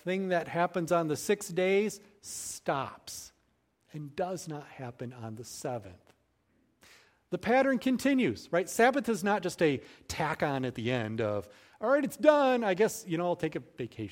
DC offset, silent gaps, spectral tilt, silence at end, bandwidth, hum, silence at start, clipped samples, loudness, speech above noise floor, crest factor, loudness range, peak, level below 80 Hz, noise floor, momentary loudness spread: under 0.1%; none; -5 dB/octave; 0 s; 16.5 kHz; none; 0.05 s; under 0.1%; -30 LUFS; 43 dB; 24 dB; 12 LU; -8 dBFS; -66 dBFS; -73 dBFS; 16 LU